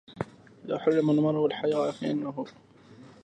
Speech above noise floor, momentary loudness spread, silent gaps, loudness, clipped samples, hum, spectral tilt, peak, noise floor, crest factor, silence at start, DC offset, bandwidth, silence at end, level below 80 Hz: 25 dB; 15 LU; none; -27 LUFS; under 0.1%; none; -7.5 dB/octave; -12 dBFS; -52 dBFS; 18 dB; 0.1 s; under 0.1%; 9 kHz; 0.15 s; -68 dBFS